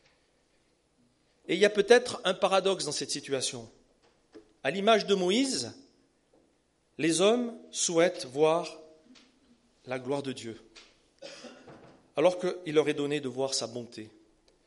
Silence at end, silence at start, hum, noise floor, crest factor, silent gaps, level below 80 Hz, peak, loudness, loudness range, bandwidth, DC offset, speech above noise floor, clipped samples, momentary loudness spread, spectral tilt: 0.6 s; 1.5 s; none; -70 dBFS; 24 dB; none; -74 dBFS; -6 dBFS; -28 LUFS; 6 LU; 11.5 kHz; under 0.1%; 42 dB; under 0.1%; 20 LU; -3.5 dB/octave